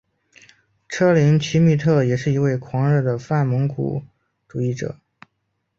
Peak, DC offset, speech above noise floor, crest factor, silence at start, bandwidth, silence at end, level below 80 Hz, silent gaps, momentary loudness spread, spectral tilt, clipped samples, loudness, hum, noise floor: -4 dBFS; under 0.1%; 55 dB; 16 dB; 0.9 s; 7.4 kHz; 0.85 s; -54 dBFS; none; 15 LU; -7.5 dB/octave; under 0.1%; -19 LUFS; none; -73 dBFS